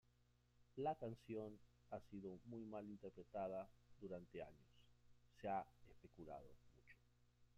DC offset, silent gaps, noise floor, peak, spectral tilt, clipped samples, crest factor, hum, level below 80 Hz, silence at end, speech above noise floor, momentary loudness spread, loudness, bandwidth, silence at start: under 0.1%; none; -78 dBFS; -34 dBFS; -8 dB/octave; under 0.1%; 20 dB; 60 Hz at -75 dBFS; -78 dBFS; 0.1 s; 26 dB; 14 LU; -53 LUFS; 11.5 kHz; 0.6 s